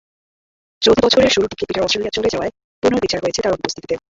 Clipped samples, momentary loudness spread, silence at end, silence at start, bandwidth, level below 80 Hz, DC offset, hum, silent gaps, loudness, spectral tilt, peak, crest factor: under 0.1%; 10 LU; 0.15 s; 0.8 s; 8 kHz; -44 dBFS; under 0.1%; none; 2.64-2.82 s; -17 LUFS; -3.5 dB/octave; -2 dBFS; 18 dB